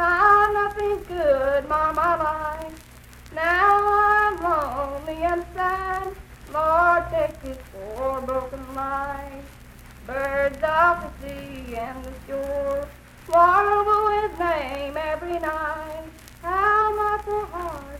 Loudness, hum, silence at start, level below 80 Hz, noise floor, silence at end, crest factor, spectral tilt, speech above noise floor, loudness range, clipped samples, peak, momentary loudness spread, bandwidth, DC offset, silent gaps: -22 LUFS; none; 0 s; -42 dBFS; -45 dBFS; 0 s; 18 dB; -5.5 dB/octave; 22 dB; 4 LU; under 0.1%; -6 dBFS; 18 LU; 16.5 kHz; under 0.1%; none